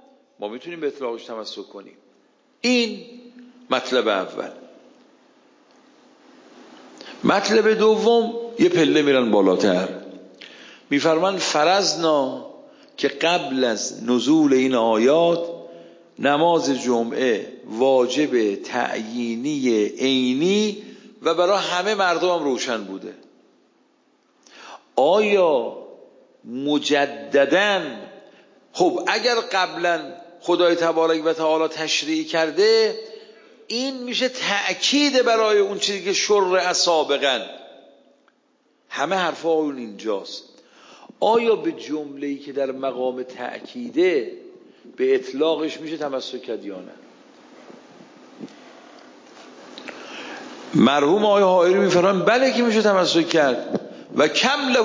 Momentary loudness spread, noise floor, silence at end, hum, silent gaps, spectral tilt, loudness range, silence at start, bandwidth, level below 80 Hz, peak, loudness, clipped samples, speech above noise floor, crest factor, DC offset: 18 LU; -63 dBFS; 0 s; none; none; -3.5 dB/octave; 8 LU; 0.4 s; 7.6 kHz; -74 dBFS; -2 dBFS; -20 LUFS; under 0.1%; 43 dB; 20 dB; under 0.1%